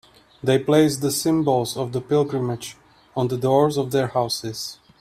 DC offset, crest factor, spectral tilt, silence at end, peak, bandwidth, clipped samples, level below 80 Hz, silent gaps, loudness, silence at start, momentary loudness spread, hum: under 0.1%; 18 dB; -5.5 dB/octave; 0.25 s; -4 dBFS; 16 kHz; under 0.1%; -58 dBFS; none; -21 LUFS; 0.45 s; 13 LU; none